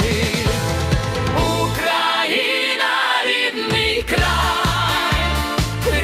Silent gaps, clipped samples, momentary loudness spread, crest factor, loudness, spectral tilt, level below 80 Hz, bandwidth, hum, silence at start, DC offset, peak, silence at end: none; under 0.1%; 3 LU; 16 dB; -18 LUFS; -4 dB/octave; -30 dBFS; 16 kHz; none; 0 s; under 0.1%; -4 dBFS; 0 s